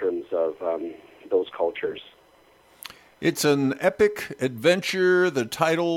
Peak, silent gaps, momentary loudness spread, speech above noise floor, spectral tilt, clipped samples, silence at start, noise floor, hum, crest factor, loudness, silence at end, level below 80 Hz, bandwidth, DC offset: -6 dBFS; none; 16 LU; 33 dB; -4.5 dB/octave; under 0.1%; 0 s; -57 dBFS; none; 18 dB; -24 LUFS; 0 s; -62 dBFS; 17 kHz; under 0.1%